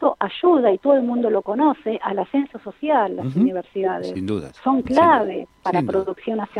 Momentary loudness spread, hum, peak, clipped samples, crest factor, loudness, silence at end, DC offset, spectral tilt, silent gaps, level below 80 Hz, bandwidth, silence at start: 10 LU; none; -4 dBFS; under 0.1%; 16 dB; -20 LUFS; 0 s; under 0.1%; -8 dB/octave; none; -56 dBFS; 10 kHz; 0 s